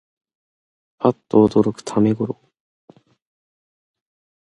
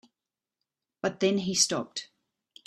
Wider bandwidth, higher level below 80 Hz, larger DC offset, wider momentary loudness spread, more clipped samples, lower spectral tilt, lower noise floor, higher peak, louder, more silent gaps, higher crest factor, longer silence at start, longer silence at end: second, 10.5 kHz vs 13.5 kHz; first, -56 dBFS vs -72 dBFS; neither; about the same, 11 LU vs 13 LU; neither; first, -8 dB/octave vs -3 dB/octave; about the same, under -90 dBFS vs under -90 dBFS; first, -2 dBFS vs -10 dBFS; first, -19 LUFS vs -27 LUFS; neither; about the same, 22 dB vs 22 dB; about the same, 1 s vs 1.05 s; first, 2.15 s vs 0.65 s